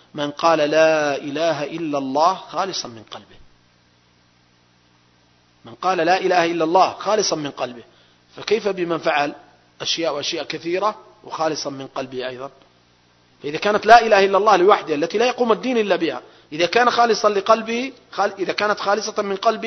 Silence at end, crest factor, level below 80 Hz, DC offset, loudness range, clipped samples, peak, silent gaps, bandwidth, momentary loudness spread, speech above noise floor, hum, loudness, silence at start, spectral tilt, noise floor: 0 s; 20 dB; -60 dBFS; under 0.1%; 10 LU; under 0.1%; 0 dBFS; none; 6.4 kHz; 14 LU; 38 dB; 60 Hz at -60 dBFS; -19 LUFS; 0.15 s; -3.5 dB/octave; -57 dBFS